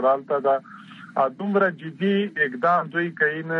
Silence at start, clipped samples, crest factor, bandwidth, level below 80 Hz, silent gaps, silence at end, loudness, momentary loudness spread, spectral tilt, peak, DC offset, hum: 0 s; under 0.1%; 14 dB; 6 kHz; -76 dBFS; none; 0 s; -23 LUFS; 6 LU; -8 dB/octave; -8 dBFS; under 0.1%; none